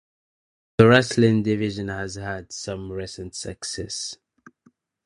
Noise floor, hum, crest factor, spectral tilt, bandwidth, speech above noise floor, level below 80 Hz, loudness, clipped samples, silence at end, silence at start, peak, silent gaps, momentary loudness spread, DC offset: -62 dBFS; none; 24 dB; -5.5 dB/octave; 11 kHz; 39 dB; -48 dBFS; -23 LUFS; under 0.1%; 0.9 s; 0.8 s; 0 dBFS; none; 18 LU; under 0.1%